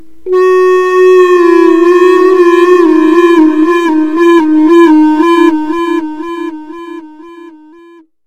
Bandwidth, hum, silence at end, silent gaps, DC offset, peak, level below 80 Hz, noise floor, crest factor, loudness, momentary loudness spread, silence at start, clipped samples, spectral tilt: 9 kHz; none; 0.7 s; none; 2%; 0 dBFS; -52 dBFS; -38 dBFS; 8 dB; -6 LUFS; 14 LU; 0.25 s; 0.5%; -4.5 dB/octave